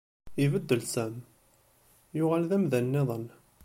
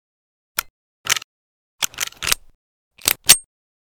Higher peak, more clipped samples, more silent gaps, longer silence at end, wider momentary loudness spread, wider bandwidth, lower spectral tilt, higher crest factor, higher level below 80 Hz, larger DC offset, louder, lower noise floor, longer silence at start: second, -10 dBFS vs 0 dBFS; second, under 0.1% vs 0.1%; second, none vs 0.70-1.04 s, 1.24-1.79 s, 2.55-2.91 s; second, 0.35 s vs 0.55 s; about the same, 13 LU vs 14 LU; second, 16.5 kHz vs over 20 kHz; first, -6.5 dB/octave vs 1.5 dB/octave; about the same, 20 dB vs 24 dB; second, -64 dBFS vs -48 dBFS; neither; second, -29 LUFS vs -19 LUFS; second, -64 dBFS vs under -90 dBFS; second, 0.25 s vs 0.6 s